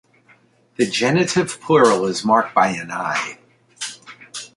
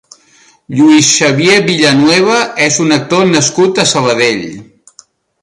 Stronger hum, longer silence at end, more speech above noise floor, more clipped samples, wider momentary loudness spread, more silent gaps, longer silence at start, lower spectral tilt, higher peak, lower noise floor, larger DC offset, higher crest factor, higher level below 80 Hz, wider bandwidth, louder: neither; second, 0.1 s vs 0.8 s; about the same, 37 dB vs 37 dB; neither; first, 17 LU vs 5 LU; neither; about the same, 0.8 s vs 0.7 s; about the same, -4.5 dB/octave vs -3.5 dB/octave; about the same, 0 dBFS vs 0 dBFS; first, -55 dBFS vs -46 dBFS; neither; first, 20 dB vs 10 dB; second, -62 dBFS vs -52 dBFS; about the same, 11.5 kHz vs 11.5 kHz; second, -18 LUFS vs -9 LUFS